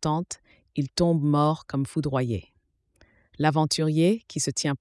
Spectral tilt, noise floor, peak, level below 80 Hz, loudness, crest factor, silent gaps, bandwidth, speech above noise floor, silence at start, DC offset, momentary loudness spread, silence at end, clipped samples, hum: -5.5 dB/octave; -64 dBFS; -8 dBFS; -56 dBFS; -25 LUFS; 18 dB; none; 12 kHz; 40 dB; 0 s; under 0.1%; 11 LU; 0.05 s; under 0.1%; none